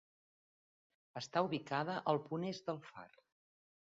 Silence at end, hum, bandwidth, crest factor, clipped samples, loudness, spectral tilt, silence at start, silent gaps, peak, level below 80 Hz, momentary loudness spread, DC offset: 0.9 s; none; 7.4 kHz; 24 dB; under 0.1%; -40 LUFS; -4.5 dB/octave; 1.15 s; none; -18 dBFS; -84 dBFS; 15 LU; under 0.1%